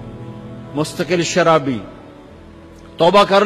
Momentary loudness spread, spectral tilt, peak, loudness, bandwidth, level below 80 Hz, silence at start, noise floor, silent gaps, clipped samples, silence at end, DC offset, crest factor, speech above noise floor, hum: 21 LU; -4.5 dB/octave; -2 dBFS; -16 LUFS; 14 kHz; -48 dBFS; 0 s; -39 dBFS; none; under 0.1%; 0 s; under 0.1%; 14 dB; 25 dB; none